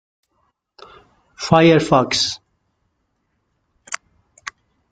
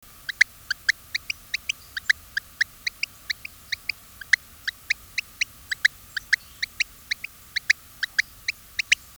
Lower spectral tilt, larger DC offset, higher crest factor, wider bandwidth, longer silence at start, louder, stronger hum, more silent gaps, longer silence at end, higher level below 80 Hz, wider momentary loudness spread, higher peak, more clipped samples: first, -5 dB/octave vs 2 dB/octave; neither; second, 20 dB vs 26 dB; second, 9.4 kHz vs over 20 kHz; first, 1.4 s vs 0.3 s; first, -15 LUFS vs -26 LUFS; neither; neither; first, 0.4 s vs 0.25 s; about the same, -54 dBFS vs -56 dBFS; first, 23 LU vs 10 LU; about the same, -2 dBFS vs -2 dBFS; neither